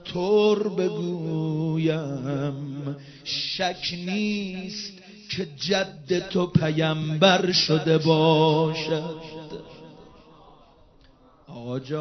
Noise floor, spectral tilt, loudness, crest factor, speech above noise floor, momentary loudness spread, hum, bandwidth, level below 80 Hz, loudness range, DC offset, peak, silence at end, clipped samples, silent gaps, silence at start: -55 dBFS; -5.5 dB/octave; -24 LUFS; 22 dB; 31 dB; 17 LU; none; 6.4 kHz; -58 dBFS; 8 LU; under 0.1%; -4 dBFS; 0 s; under 0.1%; none; 0 s